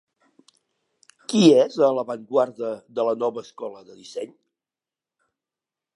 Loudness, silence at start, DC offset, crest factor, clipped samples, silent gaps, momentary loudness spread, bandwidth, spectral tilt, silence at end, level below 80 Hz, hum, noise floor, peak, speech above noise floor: -21 LUFS; 1.3 s; under 0.1%; 22 dB; under 0.1%; none; 21 LU; 11.5 kHz; -5.5 dB/octave; 1.7 s; -78 dBFS; none; under -90 dBFS; -2 dBFS; over 69 dB